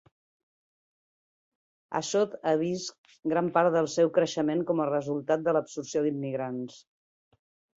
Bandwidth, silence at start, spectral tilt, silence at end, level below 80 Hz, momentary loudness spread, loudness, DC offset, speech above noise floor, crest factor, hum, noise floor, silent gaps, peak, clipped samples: 8 kHz; 1.9 s; -5.5 dB/octave; 1 s; -74 dBFS; 11 LU; -28 LUFS; under 0.1%; over 62 dB; 20 dB; none; under -90 dBFS; 2.98-3.04 s; -10 dBFS; under 0.1%